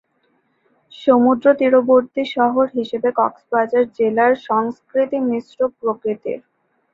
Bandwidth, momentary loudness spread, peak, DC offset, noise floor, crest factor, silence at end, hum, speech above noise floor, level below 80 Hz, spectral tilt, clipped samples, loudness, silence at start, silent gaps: 6.6 kHz; 9 LU; -2 dBFS; under 0.1%; -64 dBFS; 16 dB; 0.55 s; none; 47 dB; -64 dBFS; -7 dB/octave; under 0.1%; -18 LUFS; 0.95 s; none